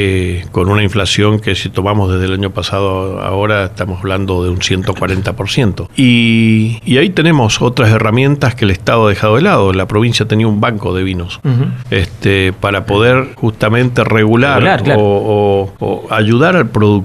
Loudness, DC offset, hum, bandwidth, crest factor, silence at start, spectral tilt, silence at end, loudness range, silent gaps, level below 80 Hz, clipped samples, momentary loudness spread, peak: -12 LUFS; under 0.1%; none; 13 kHz; 12 dB; 0 s; -6 dB/octave; 0 s; 4 LU; none; -36 dBFS; under 0.1%; 7 LU; 0 dBFS